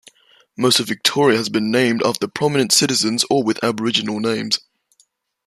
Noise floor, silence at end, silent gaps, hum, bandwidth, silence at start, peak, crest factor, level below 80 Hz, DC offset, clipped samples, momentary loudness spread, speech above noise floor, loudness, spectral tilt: -61 dBFS; 0.9 s; none; none; 15 kHz; 0.6 s; 0 dBFS; 18 dB; -62 dBFS; under 0.1%; under 0.1%; 7 LU; 43 dB; -17 LUFS; -3 dB/octave